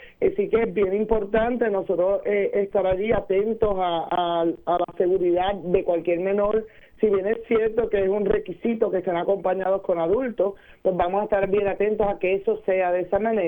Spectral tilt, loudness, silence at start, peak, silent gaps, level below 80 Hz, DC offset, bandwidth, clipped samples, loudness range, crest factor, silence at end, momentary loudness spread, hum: -9 dB/octave; -23 LUFS; 0 s; -8 dBFS; none; -44 dBFS; under 0.1%; 19 kHz; under 0.1%; 1 LU; 16 dB; 0 s; 3 LU; none